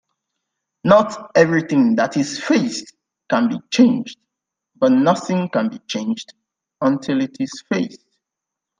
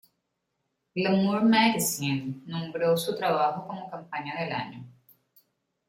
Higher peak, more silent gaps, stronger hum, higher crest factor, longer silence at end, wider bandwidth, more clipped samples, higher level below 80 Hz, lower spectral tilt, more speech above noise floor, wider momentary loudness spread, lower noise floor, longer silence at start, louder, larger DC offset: first, 0 dBFS vs -10 dBFS; neither; neither; about the same, 20 dB vs 20 dB; about the same, 0.85 s vs 0.95 s; second, 9.6 kHz vs 16.5 kHz; neither; first, -62 dBFS vs -70 dBFS; about the same, -5.5 dB/octave vs -4.5 dB/octave; first, 66 dB vs 53 dB; second, 10 LU vs 15 LU; first, -84 dBFS vs -80 dBFS; about the same, 0.85 s vs 0.95 s; first, -18 LUFS vs -27 LUFS; neither